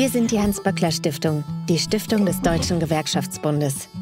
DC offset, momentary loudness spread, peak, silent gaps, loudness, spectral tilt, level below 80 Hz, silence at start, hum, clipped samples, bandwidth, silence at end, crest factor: under 0.1%; 4 LU; -4 dBFS; none; -22 LUFS; -5 dB/octave; -42 dBFS; 0 s; none; under 0.1%; 16 kHz; 0 s; 18 dB